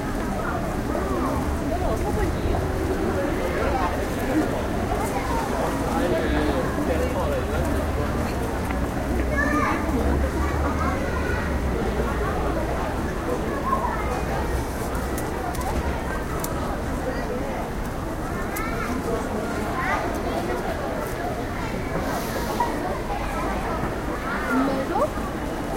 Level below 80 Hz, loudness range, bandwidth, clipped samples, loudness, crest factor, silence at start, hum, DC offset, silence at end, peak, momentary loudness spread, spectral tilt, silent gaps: -30 dBFS; 3 LU; 16 kHz; under 0.1%; -25 LUFS; 16 dB; 0 s; none; under 0.1%; 0 s; -8 dBFS; 5 LU; -6 dB/octave; none